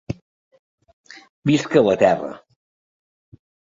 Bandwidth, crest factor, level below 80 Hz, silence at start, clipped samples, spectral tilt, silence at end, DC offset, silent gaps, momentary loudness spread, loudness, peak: 7.8 kHz; 20 dB; -56 dBFS; 0.1 s; under 0.1%; -6.5 dB/octave; 1.35 s; under 0.1%; 0.22-0.51 s, 0.59-0.78 s, 0.93-1.04 s, 1.30-1.42 s; 18 LU; -18 LUFS; -2 dBFS